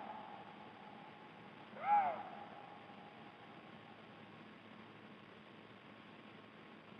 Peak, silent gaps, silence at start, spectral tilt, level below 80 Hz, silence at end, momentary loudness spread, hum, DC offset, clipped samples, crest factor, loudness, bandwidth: -24 dBFS; none; 0 s; -6.5 dB/octave; -88 dBFS; 0 s; 20 LU; none; under 0.1%; under 0.1%; 22 dB; -44 LUFS; 6 kHz